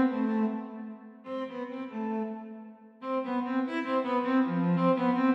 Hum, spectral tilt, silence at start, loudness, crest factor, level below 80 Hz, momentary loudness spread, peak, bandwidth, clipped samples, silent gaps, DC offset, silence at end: none; -9 dB/octave; 0 s; -30 LUFS; 16 dB; -86 dBFS; 17 LU; -14 dBFS; 5.8 kHz; under 0.1%; none; under 0.1%; 0 s